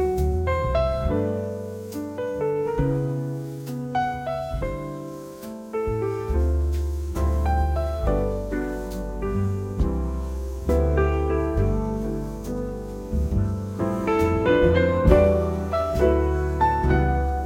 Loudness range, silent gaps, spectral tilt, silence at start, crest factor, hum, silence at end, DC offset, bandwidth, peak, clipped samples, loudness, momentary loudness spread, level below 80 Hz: 7 LU; none; -8 dB/octave; 0 s; 20 dB; none; 0 s; under 0.1%; 16.5 kHz; -2 dBFS; under 0.1%; -24 LUFS; 12 LU; -28 dBFS